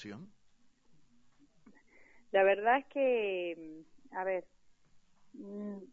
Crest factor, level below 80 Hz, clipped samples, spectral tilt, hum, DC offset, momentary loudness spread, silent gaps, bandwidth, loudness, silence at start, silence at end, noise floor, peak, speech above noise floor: 20 dB; -76 dBFS; under 0.1%; -6.5 dB/octave; none; under 0.1%; 21 LU; none; 7.2 kHz; -32 LUFS; 0 s; 0.05 s; -65 dBFS; -16 dBFS; 32 dB